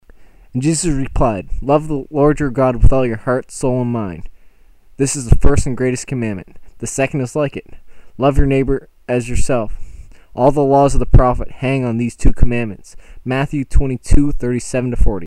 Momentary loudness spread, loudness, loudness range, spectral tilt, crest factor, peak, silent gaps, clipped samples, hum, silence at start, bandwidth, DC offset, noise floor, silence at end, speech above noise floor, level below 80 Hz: 10 LU; -17 LUFS; 3 LU; -6.5 dB/octave; 14 dB; 0 dBFS; none; under 0.1%; none; 0.2 s; 11 kHz; under 0.1%; -44 dBFS; 0 s; 30 dB; -20 dBFS